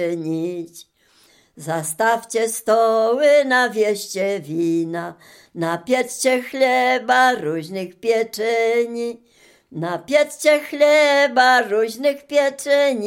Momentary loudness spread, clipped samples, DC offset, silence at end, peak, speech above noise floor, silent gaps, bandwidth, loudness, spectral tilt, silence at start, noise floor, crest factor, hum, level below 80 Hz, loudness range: 13 LU; under 0.1%; under 0.1%; 0 s; -2 dBFS; 37 dB; none; 17 kHz; -18 LUFS; -3.5 dB/octave; 0 s; -55 dBFS; 16 dB; none; -72 dBFS; 4 LU